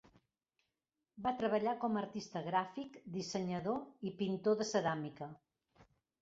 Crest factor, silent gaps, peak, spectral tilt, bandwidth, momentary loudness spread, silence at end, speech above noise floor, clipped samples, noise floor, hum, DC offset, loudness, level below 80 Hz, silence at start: 20 dB; none; -20 dBFS; -5 dB/octave; 7.6 kHz; 11 LU; 0.4 s; over 52 dB; under 0.1%; under -90 dBFS; none; under 0.1%; -38 LUFS; -76 dBFS; 1.15 s